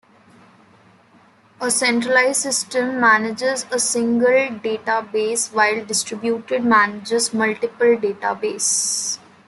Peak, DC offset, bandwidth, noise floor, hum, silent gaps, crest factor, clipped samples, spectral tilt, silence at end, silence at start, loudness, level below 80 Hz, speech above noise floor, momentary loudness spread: -2 dBFS; under 0.1%; 12.5 kHz; -52 dBFS; none; none; 18 dB; under 0.1%; -2 dB/octave; 0.3 s; 1.6 s; -18 LUFS; -68 dBFS; 33 dB; 7 LU